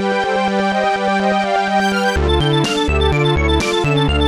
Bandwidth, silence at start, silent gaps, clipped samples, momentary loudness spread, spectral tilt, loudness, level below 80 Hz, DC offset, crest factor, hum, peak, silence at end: 13.5 kHz; 0 s; none; under 0.1%; 2 LU; -5.5 dB/octave; -16 LUFS; -24 dBFS; under 0.1%; 12 dB; none; -2 dBFS; 0 s